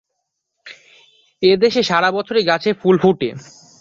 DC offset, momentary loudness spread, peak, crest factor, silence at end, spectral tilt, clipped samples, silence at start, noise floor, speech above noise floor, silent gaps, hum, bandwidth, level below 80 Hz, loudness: under 0.1%; 7 LU; -2 dBFS; 16 dB; 0.4 s; -5.5 dB/octave; under 0.1%; 0.65 s; -75 dBFS; 60 dB; none; none; 7.6 kHz; -58 dBFS; -16 LUFS